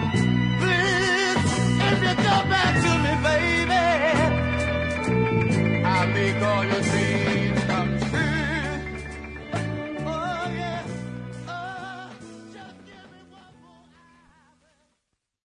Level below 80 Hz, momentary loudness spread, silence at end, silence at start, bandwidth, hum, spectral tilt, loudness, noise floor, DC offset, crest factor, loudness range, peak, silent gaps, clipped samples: -44 dBFS; 15 LU; 2.5 s; 0 s; 11 kHz; none; -5.5 dB/octave; -23 LUFS; -78 dBFS; under 0.1%; 16 dB; 15 LU; -8 dBFS; none; under 0.1%